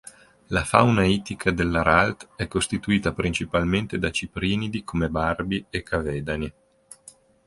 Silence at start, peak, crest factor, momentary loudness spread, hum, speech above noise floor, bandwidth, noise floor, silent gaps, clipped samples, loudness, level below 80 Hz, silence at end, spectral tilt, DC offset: 0.05 s; 0 dBFS; 24 dB; 10 LU; none; 29 dB; 11.5 kHz; -52 dBFS; none; under 0.1%; -24 LUFS; -40 dBFS; 0.95 s; -5.5 dB/octave; under 0.1%